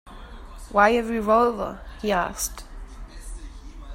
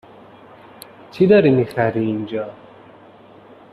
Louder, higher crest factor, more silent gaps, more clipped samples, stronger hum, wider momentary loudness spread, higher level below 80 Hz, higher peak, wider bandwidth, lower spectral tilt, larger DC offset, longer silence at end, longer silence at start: second, -23 LUFS vs -17 LUFS; about the same, 22 dB vs 18 dB; neither; neither; neither; about the same, 24 LU vs 26 LU; first, -40 dBFS vs -58 dBFS; about the same, -4 dBFS vs -2 dBFS; first, 16 kHz vs 14 kHz; second, -4 dB/octave vs -8 dB/octave; neither; second, 0 s vs 1.2 s; second, 0.05 s vs 1.15 s